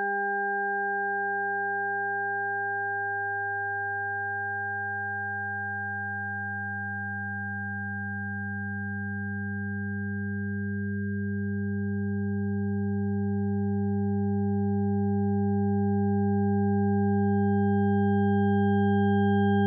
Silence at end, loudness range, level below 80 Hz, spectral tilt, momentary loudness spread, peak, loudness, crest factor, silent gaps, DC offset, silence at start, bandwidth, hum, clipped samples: 0 s; 7 LU; -68 dBFS; -3.5 dB/octave; 8 LU; -16 dBFS; -28 LUFS; 10 dB; none; under 0.1%; 0 s; 3.3 kHz; none; under 0.1%